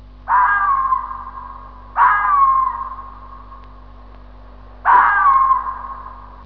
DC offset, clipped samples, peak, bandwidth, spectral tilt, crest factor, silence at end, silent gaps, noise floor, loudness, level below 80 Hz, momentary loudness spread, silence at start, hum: 0.3%; under 0.1%; -2 dBFS; 5 kHz; -6.5 dB/octave; 16 dB; 0 s; none; -39 dBFS; -15 LUFS; -40 dBFS; 21 LU; 0.2 s; 50 Hz at -40 dBFS